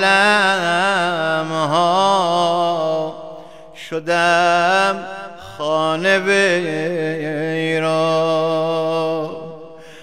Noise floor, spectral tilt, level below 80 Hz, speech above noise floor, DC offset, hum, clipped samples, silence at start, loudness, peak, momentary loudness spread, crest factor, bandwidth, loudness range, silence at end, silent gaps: -37 dBFS; -4 dB/octave; -62 dBFS; 21 dB; 0.6%; none; under 0.1%; 0 s; -17 LUFS; 0 dBFS; 16 LU; 18 dB; 15 kHz; 2 LU; 0 s; none